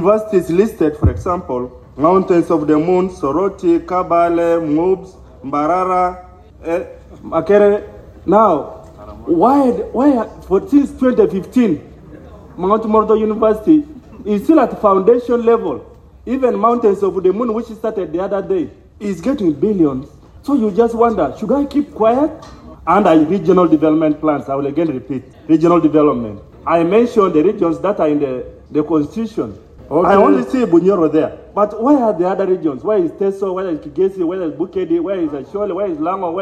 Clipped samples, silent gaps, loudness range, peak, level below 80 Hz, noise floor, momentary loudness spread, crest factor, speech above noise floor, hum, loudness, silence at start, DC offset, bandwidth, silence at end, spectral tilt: under 0.1%; none; 3 LU; 0 dBFS; -40 dBFS; -36 dBFS; 11 LU; 14 dB; 22 dB; none; -15 LUFS; 0 s; under 0.1%; 12.5 kHz; 0 s; -8.5 dB/octave